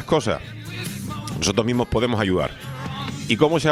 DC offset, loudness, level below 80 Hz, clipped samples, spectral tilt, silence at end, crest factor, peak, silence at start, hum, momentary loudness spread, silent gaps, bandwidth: under 0.1%; -23 LUFS; -44 dBFS; under 0.1%; -5 dB/octave; 0 s; 20 dB; -2 dBFS; 0 s; none; 11 LU; none; 16.5 kHz